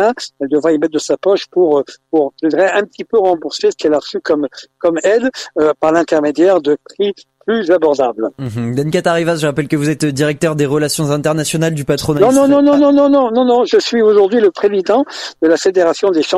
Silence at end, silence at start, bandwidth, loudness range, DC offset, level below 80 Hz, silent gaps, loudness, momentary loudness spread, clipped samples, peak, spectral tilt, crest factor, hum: 0 s; 0 s; 14 kHz; 4 LU; under 0.1%; -50 dBFS; none; -13 LUFS; 8 LU; under 0.1%; 0 dBFS; -5.5 dB/octave; 12 dB; none